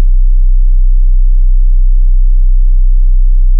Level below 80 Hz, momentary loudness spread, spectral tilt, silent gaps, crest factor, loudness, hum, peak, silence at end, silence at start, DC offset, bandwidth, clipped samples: -4 dBFS; 0 LU; -16 dB/octave; none; 4 dB; -13 LUFS; none; -2 dBFS; 0 s; 0 s; under 0.1%; 0.1 kHz; under 0.1%